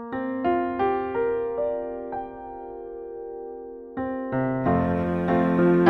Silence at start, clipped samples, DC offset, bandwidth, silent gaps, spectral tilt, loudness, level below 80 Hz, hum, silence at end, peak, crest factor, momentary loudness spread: 0 s; under 0.1%; under 0.1%; 4.4 kHz; none; -10 dB/octave; -26 LUFS; -50 dBFS; none; 0 s; -6 dBFS; 20 dB; 15 LU